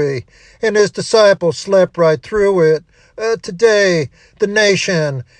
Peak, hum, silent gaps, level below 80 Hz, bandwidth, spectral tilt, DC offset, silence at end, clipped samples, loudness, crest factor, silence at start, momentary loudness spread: 0 dBFS; none; none; -48 dBFS; 10 kHz; -4.5 dB/octave; under 0.1%; 0.15 s; under 0.1%; -14 LUFS; 14 dB; 0 s; 9 LU